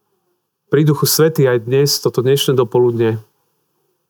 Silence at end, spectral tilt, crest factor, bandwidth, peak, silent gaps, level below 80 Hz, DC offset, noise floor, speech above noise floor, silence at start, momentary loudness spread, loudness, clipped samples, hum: 0.9 s; -5 dB/octave; 14 dB; over 20 kHz; -2 dBFS; none; -72 dBFS; under 0.1%; -68 dBFS; 55 dB; 0.7 s; 6 LU; -14 LUFS; under 0.1%; none